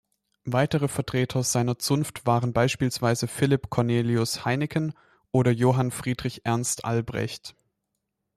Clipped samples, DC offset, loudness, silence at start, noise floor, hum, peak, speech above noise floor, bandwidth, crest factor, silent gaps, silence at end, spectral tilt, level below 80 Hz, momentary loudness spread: under 0.1%; under 0.1%; -25 LUFS; 0.45 s; -80 dBFS; none; -8 dBFS; 56 dB; 14.5 kHz; 18 dB; none; 0.85 s; -5.5 dB/octave; -56 dBFS; 7 LU